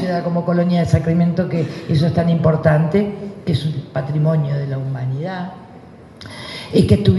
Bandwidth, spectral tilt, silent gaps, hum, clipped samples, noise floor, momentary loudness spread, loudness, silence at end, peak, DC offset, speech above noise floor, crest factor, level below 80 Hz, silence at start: 11.5 kHz; -8.5 dB/octave; none; none; under 0.1%; -40 dBFS; 14 LU; -18 LUFS; 0 s; 0 dBFS; under 0.1%; 23 dB; 18 dB; -42 dBFS; 0 s